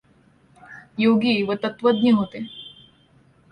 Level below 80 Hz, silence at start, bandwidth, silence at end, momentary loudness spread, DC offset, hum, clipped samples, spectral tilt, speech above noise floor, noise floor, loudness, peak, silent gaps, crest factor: -62 dBFS; 0.7 s; 9.2 kHz; 0.85 s; 18 LU; under 0.1%; none; under 0.1%; -7.5 dB/octave; 37 dB; -57 dBFS; -20 LUFS; -6 dBFS; none; 16 dB